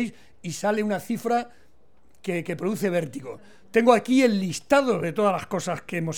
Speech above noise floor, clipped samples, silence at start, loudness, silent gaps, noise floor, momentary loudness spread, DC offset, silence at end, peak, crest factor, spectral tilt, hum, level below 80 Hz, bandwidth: 38 dB; under 0.1%; 0 s; -24 LUFS; none; -62 dBFS; 17 LU; 0.4%; 0 s; -4 dBFS; 20 dB; -5.5 dB/octave; none; -62 dBFS; 18.5 kHz